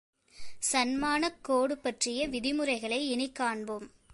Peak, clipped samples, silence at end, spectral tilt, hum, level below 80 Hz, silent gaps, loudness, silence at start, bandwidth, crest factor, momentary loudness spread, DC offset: -14 dBFS; under 0.1%; 0.25 s; -2 dB/octave; none; -60 dBFS; none; -31 LUFS; 0.35 s; 12 kHz; 18 dB; 5 LU; under 0.1%